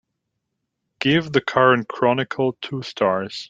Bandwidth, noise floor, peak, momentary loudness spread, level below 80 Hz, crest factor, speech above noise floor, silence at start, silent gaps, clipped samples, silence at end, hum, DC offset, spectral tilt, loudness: 7.8 kHz; -78 dBFS; -2 dBFS; 8 LU; -60 dBFS; 20 dB; 58 dB; 1 s; none; under 0.1%; 0.05 s; none; under 0.1%; -6 dB/octave; -20 LUFS